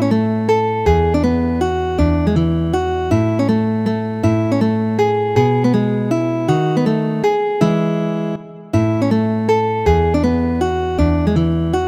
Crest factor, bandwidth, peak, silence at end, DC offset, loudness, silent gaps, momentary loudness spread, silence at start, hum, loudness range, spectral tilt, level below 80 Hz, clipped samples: 14 dB; 10 kHz; -2 dBFS; 0 s; under 0.1%; -17 LUFS; none; 3 LU; 0 s; none; 1 LU; -8 dB/octave; -30 dBFS; under 0.1%